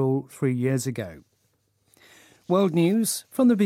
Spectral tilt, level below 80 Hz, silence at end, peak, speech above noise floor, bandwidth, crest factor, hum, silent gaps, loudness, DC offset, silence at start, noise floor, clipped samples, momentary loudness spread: -6 dB/octave; -68 dBFS; 0 s; -10 dBFS; 47 dB; 16.5 kHz; 16 dB; none; none; -24 LUFS; under 0.1%; 0 s; -69 dBFS; under 0.1%; 10 LU